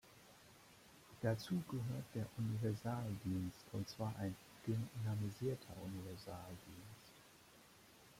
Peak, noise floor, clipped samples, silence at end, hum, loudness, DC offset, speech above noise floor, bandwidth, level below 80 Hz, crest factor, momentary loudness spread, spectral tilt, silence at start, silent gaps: -26 dBFS; -65 dBFS; under 0.1%; 0 s; none; -45 LUFS; under 0.1%; 21 dB; 16.5 kHz; -72 dBFS; 18 dB; 21 LU; -7 dB/octave; 0.05 s; none